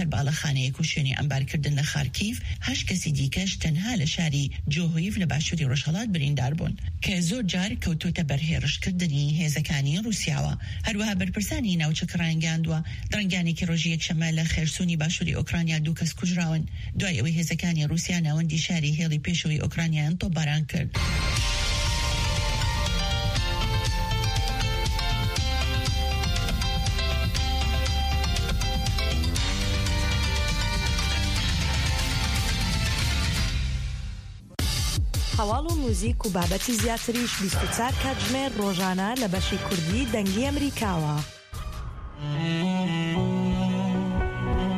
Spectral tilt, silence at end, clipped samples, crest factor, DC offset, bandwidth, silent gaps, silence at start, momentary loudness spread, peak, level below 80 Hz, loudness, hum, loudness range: -4.5 dB/octave; 0 s; under 0.1%; 14 dB; under 0.1%; 15.5 kHz; none; 0 s; 3 LU; -10 dBFS; -32 dBFS; -26 LUFS; none; 2 LU